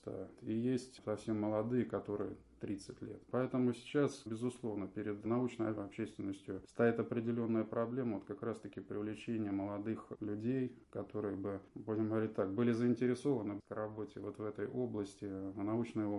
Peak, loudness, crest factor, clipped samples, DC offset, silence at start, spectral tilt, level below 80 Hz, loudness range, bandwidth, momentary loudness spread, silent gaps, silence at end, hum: -20 dBFS; -39 LUFS; 18 dB; under 0.1%; under 0.1%; 0.05 s; -7.5 dB/octave; -70 dBFS; 3 LU; 11.5 kHz; 10 LU; none; 0 s; none